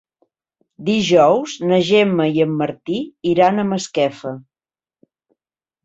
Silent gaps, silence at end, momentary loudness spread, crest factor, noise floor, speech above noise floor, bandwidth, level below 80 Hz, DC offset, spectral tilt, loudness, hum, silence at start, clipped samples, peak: none; 1.45 s; 12 LU; 16 dB; under -90 dBFS; over 74 dB; 8 kHz; -60 dBFS; under 0.1%; -5.5 dB/octave; -17 LUFS; none; 0.8 s; under 0.1%; -2 dBFS